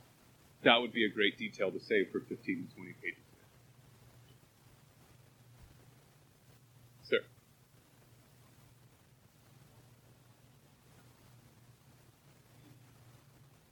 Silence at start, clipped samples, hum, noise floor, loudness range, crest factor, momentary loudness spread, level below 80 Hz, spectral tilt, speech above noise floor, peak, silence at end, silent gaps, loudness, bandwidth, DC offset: 0.6 s; under 0.1%; none; -65 dBFS; 28 LU; 32 dB; 16 LU; -76 dBFS; -5 dB/octave; 31 dB; -8 dBFS; 6.5 s; none; -33 LUFS; 19 kHz; under 0.1%